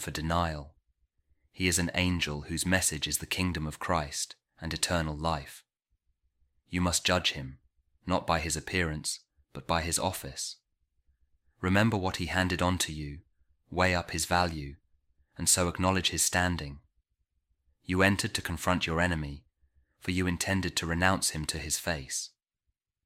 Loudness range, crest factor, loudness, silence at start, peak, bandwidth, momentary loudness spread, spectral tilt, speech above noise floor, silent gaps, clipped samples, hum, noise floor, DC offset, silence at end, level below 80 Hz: 4 LU; 24 dB; -29 LUFS; 0 s; -6 dBFS; 16.5 kHz; 14 LU; -3.5 dB/octave; 53 dB; none; under 0.1%; none; -83 dBFS; under 0.1%; 0.8 s; -48 dBFS